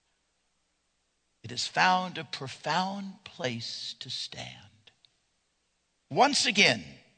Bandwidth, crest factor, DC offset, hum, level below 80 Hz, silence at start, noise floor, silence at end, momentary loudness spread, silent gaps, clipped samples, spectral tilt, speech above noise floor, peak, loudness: 9.4 kHz; 26 dB; under 0.1%; none; -74 dBFS; 1.45 s; -76 dBFS; 0.25 s; 16 LU; none; under 0.1%; -2.5 dB/octave; 47 dB; -6 dBFS; -28 LUFS